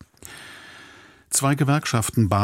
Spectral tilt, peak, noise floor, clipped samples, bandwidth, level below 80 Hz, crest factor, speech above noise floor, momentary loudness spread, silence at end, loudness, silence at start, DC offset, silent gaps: -4.5 dB/octave; -6 dBFS; -48 dBFS; under 0.1%; 16.5 kHz; -52 dBFS; 18 dB; 28 dB; 22 LU; 0 s; -21 LUFS; 0.25 s; under 0.1%; none